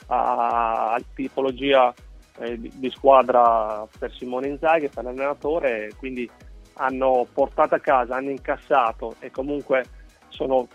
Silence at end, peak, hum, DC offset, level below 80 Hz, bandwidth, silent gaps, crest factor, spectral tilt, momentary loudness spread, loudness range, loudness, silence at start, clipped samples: 0.1 s; -2 dBFS; none; under 0.1%; -48 dBFS; 9.4 kHz; none; 20 dB; -6 dB/octave; 15 LU; 4 LU; -22 LUFS; 0.05 s; under 0.1%